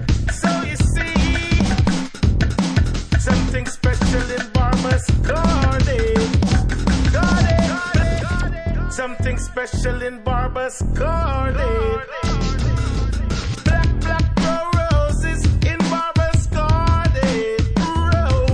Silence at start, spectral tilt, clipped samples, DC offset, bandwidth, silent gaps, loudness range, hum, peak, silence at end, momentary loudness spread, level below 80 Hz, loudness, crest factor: 0 s; -6 dB/octave; under 0.1%; under 0.1%; 10.5 kHz; none; 4 LU; none; -4 dBFS; 0 s; 6 LU; -22 dBFS; -19 LUFS; 14 dB